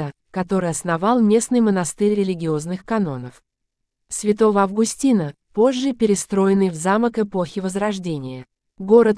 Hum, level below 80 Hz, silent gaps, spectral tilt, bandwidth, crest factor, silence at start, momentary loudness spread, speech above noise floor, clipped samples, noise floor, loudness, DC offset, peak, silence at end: none; -54 dBFS; none; -5.5 dB/octave; 11 kHz; 18 dB; 0 s; 12 LU; 59 dB; under 0.1%; -78 dBFS; -20 LUFS; under 0.1%; -2 dBFS; 0 s